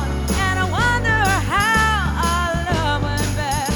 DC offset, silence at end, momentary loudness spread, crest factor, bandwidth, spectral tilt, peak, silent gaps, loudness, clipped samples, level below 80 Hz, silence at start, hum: under 0.1%; 0 s; 5 LU; 14 dB; 19.5 kHz; -4.5 dB/octave; -4 dBFS; none; -18 LUFS; under 0.1%; -26 dBFS; 0 s; none